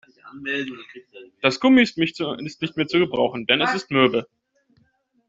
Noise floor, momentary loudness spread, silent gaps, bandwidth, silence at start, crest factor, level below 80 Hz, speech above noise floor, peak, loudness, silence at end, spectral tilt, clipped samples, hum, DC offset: -64 dBFS; 13 LU; none; 7.8 kHz; 0.25 s; 20 dB; -62 dBFS; 43 dB; -2 dBFS; -21 LUFS; 1.05 s; -5 dB/octave; under 0.1%; none; under 0.1%